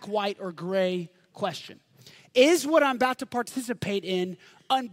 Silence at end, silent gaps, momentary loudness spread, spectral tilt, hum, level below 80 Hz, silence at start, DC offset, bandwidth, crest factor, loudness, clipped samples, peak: 0 s; none; 14 LU; -4 dB/octave; none; -72 dBFS; 0 s; under 0.1%; 16 kHz; 20 dB; -26 LUFS; under 0.1%; -6 dBFS